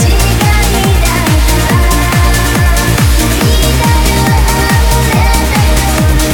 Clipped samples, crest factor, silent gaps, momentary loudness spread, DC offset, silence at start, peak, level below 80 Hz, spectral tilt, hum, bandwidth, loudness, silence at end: under 0.1%; 8 dB; none; 1 LU; under 0.1%; 0 s; 0 dBFS; -12 dBFS; -4.5 dB/octave; none; 19.5 kHz; -9 LUFS; 0 s